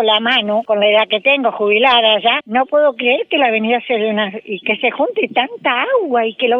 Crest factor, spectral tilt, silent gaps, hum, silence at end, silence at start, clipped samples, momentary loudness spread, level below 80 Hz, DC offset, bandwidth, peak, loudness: 14 dB; -6 dB/octave; none; none; 0 s; 0 s; under 0.1%; 6 LU; -64 dBFS; under 0.1%; 5.6 kHz; 0 dBFS; -14 LUFS